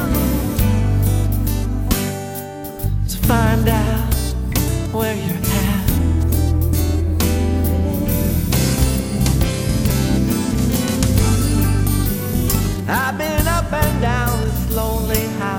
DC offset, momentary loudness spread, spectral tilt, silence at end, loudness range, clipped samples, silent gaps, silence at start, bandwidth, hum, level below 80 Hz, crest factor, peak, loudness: under 0.1%; 4 LU; -5.5 dB/octave; 0 s; 2 LU; under 0.1%; none; 0 s; over 20 kHz; none; -22 dBFS; 16 dB; 0 dBFS; -18 LUFS